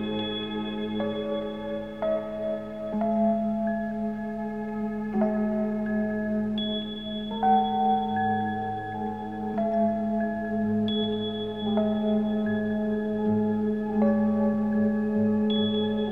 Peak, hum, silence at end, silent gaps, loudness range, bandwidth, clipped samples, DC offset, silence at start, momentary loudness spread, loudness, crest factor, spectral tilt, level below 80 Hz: -12 dBFS; none; 0 s; none; 3 LU; 4 kHz; under 0.1%; 0.2%; 0 s; 8 LU; -27 LUFS; 16 dB; -8.5 dB/octave; -58 dBFS